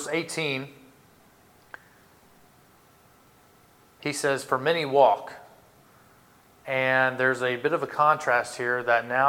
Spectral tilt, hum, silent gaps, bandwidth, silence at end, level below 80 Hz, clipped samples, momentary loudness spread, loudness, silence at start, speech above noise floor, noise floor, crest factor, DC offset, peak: -4 dB/octave; none; none; 18.5 kHz; 0 s; -72 dBFS; under 0.1%; 13 LU; -24 LUFS; 0 s; 33 dB; -58 dBFS; 20 dB; under 0.1%; -6 dBFS